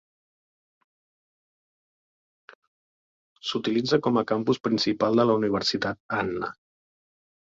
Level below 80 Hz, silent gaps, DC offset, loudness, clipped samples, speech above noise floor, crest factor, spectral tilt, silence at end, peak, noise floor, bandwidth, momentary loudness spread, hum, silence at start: -64 dBFS; 4.60-4.64 s, 6.00-6.09 s; under 0.1%; -25 LUFS; under 0.1%; over 65 dB; 20 dB; -5.5 dB/octave; 0.95 s; -10 dBFS; under -90 dBFS; 7.8 kHz; 9 LU; none; 3.45 s